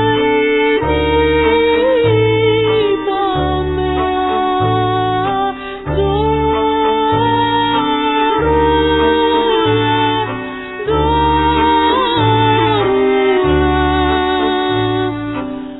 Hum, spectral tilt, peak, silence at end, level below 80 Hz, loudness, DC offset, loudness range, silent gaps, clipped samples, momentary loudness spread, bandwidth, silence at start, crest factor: none; -9.5 dB/octave; -2 dBFS; 0 s; -28 dBFS; -14 LUFS; 0.2%; 3 LU; none; under 0.1%; 6 LU; 4.1 kHz; 0 s; 12 dB